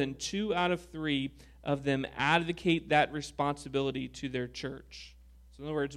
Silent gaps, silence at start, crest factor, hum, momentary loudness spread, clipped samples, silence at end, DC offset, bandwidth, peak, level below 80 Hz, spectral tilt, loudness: none; 0 s; 22 dB; none; 14 LU; under 0.1%; 0 s; under 0.1%; 13.5 kHz; -12 dBFS; -56 dBFS; -5 dB/octave; -32 LUFS